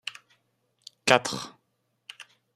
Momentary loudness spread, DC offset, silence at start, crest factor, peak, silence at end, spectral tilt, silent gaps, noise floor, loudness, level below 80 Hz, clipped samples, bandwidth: 26 LU; under 0.1%; 0.05 s; 30 dB; 0 dBFS; 1.05 s; -2.5 dB/octave; none; -75 dBFS; -25 LUFS; -70 dBFS; under 0.1%; 15 kHz